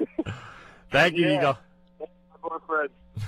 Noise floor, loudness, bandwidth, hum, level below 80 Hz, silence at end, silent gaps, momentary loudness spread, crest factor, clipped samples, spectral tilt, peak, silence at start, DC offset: -47 dBFS; -25 LUFS; 15.5 kHz; none; -56 dBFS; 0 s; none; 23 LU; 22 dB; under 0.1%; -5.5 dB/octave; -6 dBFS; 0 s; under 0.1%